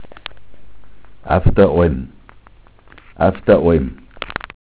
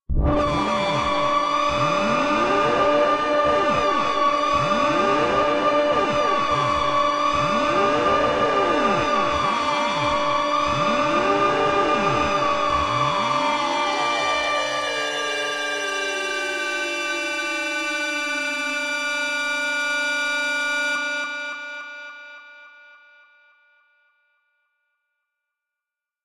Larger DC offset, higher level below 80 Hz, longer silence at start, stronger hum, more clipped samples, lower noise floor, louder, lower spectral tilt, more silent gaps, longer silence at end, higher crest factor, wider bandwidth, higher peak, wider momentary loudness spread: neither; first, -30 dBFS vs -40 dBFS; about the same, 0 s vs 0.1 s; neither; neither; second, -45 dBFS vs -88 dBFS; first, -16 LUFS vs -21 LUFS; first, -11.5 dB/octave vs -3.5 dB/octave; neither; second, 0.4 s vs 3.55 s; about the same, 18 dB vs 14 dB; second, 4 kHz vs 13.5 kHz; first, 0 dBFS vs -8 dBFS; first, 21 LU vs 5 LU